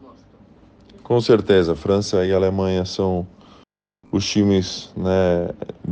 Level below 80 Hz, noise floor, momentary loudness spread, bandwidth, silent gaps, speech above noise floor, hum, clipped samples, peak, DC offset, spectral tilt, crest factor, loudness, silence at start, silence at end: -52 dBFS; -55 dBFS; 10 LU; 9 kHz; none; 36 dB; none; under 0.1%; -4 dBFS; under 0.1%; -6 dB/octave; 18 dB; -19 LUFS; 0.05 s; 0 s